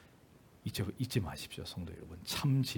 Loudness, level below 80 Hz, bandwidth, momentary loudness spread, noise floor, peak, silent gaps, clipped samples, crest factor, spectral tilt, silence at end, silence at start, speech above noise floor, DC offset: -38 LUFS; -62 dBFS; 18 kHz; 14 LU; -61 dBFS; -18 dBFS; none; under 0.1%; 20 dB; -5.5 dB/octave; 0 s; 0 s; 25 dB; under 0.1%